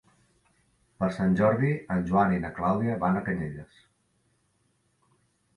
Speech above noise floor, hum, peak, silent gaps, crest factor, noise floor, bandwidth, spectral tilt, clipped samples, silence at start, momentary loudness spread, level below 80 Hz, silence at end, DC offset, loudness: 45 dB; none; -10 dBFS; none; 18 dB; -71 dBFS; 10.5 kHz; -9 dB/octave; under 0.1%; 1 s; 9 LU; -54 dBFS; 1.95 s; under 0.1%; -27 LUFS